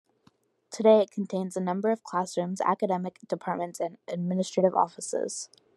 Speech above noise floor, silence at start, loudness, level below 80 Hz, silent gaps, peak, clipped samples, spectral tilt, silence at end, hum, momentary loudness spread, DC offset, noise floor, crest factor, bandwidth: 38 dB; 0.7 s; -28 LUFS; -80 dBFS; none; -8 dBFS; under 0.1%; -5.5 dB/octave; 0.3 s; none; 12 LU; under 0.1%; -66 dBFS; 20 dB; 12 kHz